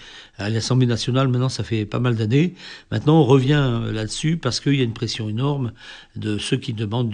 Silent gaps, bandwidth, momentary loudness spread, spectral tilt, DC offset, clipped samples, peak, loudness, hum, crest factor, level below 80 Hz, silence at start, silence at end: none; 10 kHz; 12 LU; -6 dB/octave; under 0.1%; under 0.1%; -4 dBFS; -21 LUFS; none; 18 dB; -46 dBFS; 0 s; 0 s